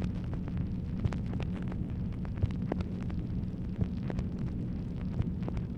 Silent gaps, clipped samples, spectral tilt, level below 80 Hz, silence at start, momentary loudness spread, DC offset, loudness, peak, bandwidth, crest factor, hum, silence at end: none; under 0.1%; -9.5 dB/octave; -40 dBFS; 0 s; 3 LU; under 0.1%; -36 LUFS; -16 dBFS; 8.2 kHz; 18 dB; none; 0 s